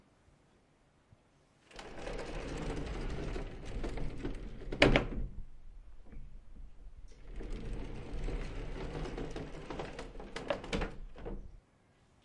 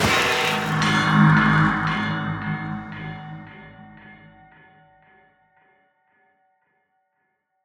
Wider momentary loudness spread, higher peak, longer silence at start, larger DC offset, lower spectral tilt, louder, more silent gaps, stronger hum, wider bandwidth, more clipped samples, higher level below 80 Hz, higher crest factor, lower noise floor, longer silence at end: about the same, 20 LU vs 22 LU; about the same, -6 dBFS vs -4 dBFS; first, 1.7 s vs 0 s; neither; about the same, -5.5 dB/octave vs -5 dB/octave; second, -39 LUFS vs -20 LUFS; neither; neither; second, 11 kHz vs 19 kHz; neither; about the same, -44 dBFS vs -48 dBFS; first, 34 dB vs 20 dB; second, -68 dBFS vs -73 dBFS; second, 0.65 s vs 3.5 s